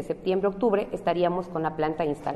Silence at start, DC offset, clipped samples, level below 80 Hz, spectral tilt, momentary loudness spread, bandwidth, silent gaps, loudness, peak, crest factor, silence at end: 0 s; under 0.1%; under 0.1%; -52 dBFS; -7.5 dB/octave; 4 LU; 12 kHz; none; -26 LUFS; -12 dBFS; 14 dB; 0 s